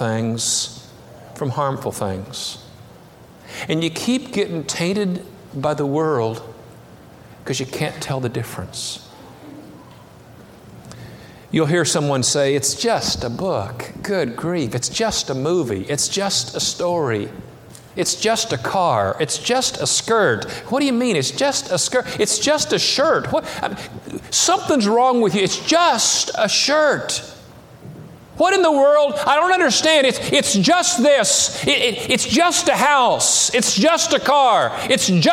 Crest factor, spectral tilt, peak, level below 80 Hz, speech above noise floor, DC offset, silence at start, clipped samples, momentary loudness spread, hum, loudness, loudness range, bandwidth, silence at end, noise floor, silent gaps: 18 dB; -3 dB/octave; -2 dBFS; -52 dBFS; 26 dB; under 0.1%; 0 s; under 0.1%; 13 LU; none; -18 LUFS; 11 LU; 17 kHz; 0 s; -44 dBFS; none